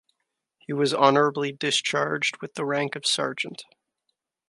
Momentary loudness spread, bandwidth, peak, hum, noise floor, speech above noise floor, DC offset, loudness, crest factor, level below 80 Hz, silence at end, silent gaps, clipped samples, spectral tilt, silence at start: 12 LU; 11.5 kHz; -2 dBFS; none; -80 dBFS; 55 dB; under 0.1%; -24 LUFS; 24 dB; -78 dBFS; 0.85 s; none; under 0.1%; -3.5 dB/octave; 0.7 s